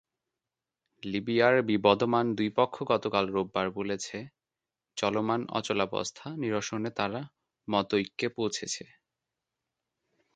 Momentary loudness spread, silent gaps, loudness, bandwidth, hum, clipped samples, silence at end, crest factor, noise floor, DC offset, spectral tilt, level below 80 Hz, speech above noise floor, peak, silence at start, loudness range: 14 LU; none; -29 LUFS; 9.4 kHz; none; under 0.1%; 1.5 s; 26 dB; under -90 dBFS; under 0.1%; -4.5 dB/octave; -66 dBFS; over 61 dB; -6 dBFS; 1.05 s; 6 LU